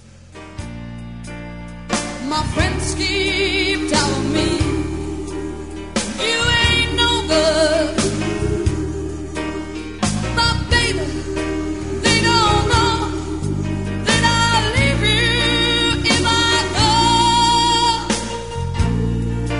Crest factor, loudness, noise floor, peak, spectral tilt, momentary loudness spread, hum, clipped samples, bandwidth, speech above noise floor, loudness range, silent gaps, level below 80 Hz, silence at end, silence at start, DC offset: 18 dB; -17 LUFS; -39 dBFS; 0 dBFS; -4 dB/octave; 13 LU; none; under 0.1%; 11 kHz; 20 dB; 6 LU; none; -30 dBFS; 0 s; 0 s; 0.9%